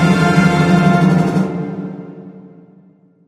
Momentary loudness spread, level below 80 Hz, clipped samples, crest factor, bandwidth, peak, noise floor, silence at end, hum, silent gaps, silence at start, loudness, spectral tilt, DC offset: 20 LU; -48 dBFS; under 0.1%; 14 dB; 11.5 kHz; 0 dBFS; -48 dBFS; 0.8 s; none; none; 0 s; -13 LUFS; -7 dB/octave; under 0.1%